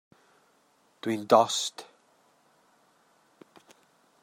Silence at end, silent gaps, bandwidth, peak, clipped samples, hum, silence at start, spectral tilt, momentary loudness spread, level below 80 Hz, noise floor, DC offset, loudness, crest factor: 2.4 s; none; 16 kHz; -4 dBFS; under 0.1%; none; 1.05 s; -3 dB/octave; 16 LU; -84 dBFS; -66 dBFS; under 0.1%; -26 LUFS; 28 dB